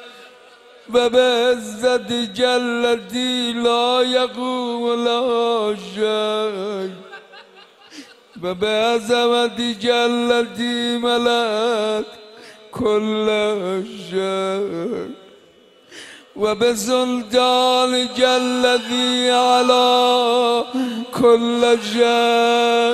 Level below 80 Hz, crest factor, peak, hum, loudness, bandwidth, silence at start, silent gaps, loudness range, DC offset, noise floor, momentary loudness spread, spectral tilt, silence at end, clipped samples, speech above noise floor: -60 dBFS; 16 dB; -2 dBFS; none; -18 LUFS; 14 kHz; 0 s; none; 7 LU; under 0.1%; -50 dBFS; 11 LU; -3 dB/octave; 0 s; under 0.1%; 32 dB